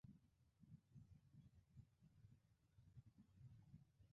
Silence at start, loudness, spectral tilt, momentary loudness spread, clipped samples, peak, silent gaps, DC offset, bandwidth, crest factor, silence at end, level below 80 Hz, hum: 0.05 s; -69 LUFS; -9 dB/octave; 2 LU; under 0.1%; -52 dBFS; none; under 0.1%; 4 kHz; 18 dB; 0 s; -80 dBFS; none